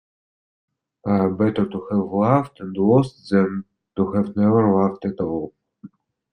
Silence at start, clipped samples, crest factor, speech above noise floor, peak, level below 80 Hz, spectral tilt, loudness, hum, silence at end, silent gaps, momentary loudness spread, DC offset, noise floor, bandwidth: 1.05 s; under 0.1%; 18 dB; 26 dB; -2 dBFS; -56 dBFS; -9.5 dB/octave; -20 LUFS; none; 0.45 s; none; 12 LU; under 0.1%; -46 dBFS; 8.8 kHz